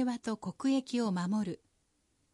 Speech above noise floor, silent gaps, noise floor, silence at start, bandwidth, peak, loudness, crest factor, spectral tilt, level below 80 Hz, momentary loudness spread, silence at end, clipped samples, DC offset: 42 dB; none; -75 dBFS; 0 s; 11.5 kHz; -20 dBFS; -34 LUFS; 14 dB; -6 dB/octave; -74 dBFS; 8 LU; 0.8 s; under 0.1%; under 0.1%